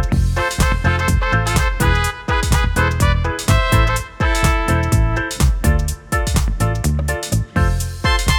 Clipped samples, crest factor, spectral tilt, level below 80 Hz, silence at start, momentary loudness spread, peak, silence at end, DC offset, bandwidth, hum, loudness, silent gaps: under 0.1%; 14 dB; -5 dB/octave; -20 dBFS; 0 s; 4 LU; -2 dBFS; 0 s; under 0.1%; 18.5 kHz; none; -17 LUFS; none